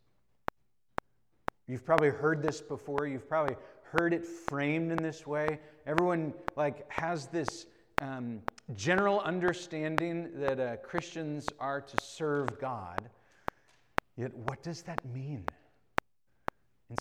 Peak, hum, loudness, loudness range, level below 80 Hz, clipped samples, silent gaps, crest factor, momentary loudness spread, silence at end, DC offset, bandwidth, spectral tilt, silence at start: -4 dBFS; none; -34 LUFS; 7 LU; -60 dBFS; under 0.1%; none; 30 dB; 14 LU; 0 s; under 0.1%; 19 kHz; -6 dB/octave; 1.7 s